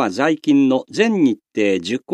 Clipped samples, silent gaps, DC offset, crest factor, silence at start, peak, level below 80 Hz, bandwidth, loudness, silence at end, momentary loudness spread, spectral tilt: under 0.1%; none; under 0.1%; 16 dB; 0 s; -2 dBFS; -70 dBFS; 10 kHz; -17 LUFS; 0 s; 4 LU; -5.5 dB/octave